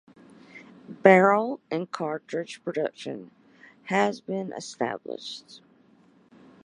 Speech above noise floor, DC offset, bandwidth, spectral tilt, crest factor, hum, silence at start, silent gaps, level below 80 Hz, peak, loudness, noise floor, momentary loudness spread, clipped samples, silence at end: 34 dB; under 0.1%; 10.5 kHz; -5.5 dB/octave; 26 dB; none; 0.55 s; none; -76 dBFS; -2 dBFS; -25 LUFS; -59 dBFS; 21 LU; under 0.1%; 1.05 s